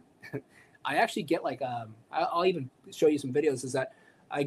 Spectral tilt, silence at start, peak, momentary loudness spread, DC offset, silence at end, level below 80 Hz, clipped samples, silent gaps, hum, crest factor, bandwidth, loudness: -5 dB/octave; 0.25 s; -12 dBFS; 15 LU; under 0.1%; 0 s; -76 dBFS; under 0.1%; none; none; 20 dB; 15 kHz; -30 LUFS